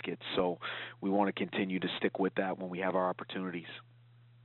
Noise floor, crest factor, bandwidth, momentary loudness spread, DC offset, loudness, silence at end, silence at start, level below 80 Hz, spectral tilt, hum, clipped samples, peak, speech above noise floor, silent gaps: -60 dBFS; 20 dB; 4.3 kHz; 9 LU; under 0.1%; -34 LUFS; 0.6 s; 0.05 s; -74 dBFS; -4 dB/octave; none; under 0.1%; -16 dBFS; 26 dB; none